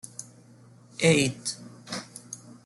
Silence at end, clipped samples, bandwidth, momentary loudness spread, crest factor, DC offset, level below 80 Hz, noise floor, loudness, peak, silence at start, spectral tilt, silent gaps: 0.15 s; under 0.1%; 12 kHz; 21 LU; 22 dB; under 0.1%; -64 dBFS; -53 dBFS; -26 LUFS; -8 dBFS; 0.05 s; -4 dB/octave; none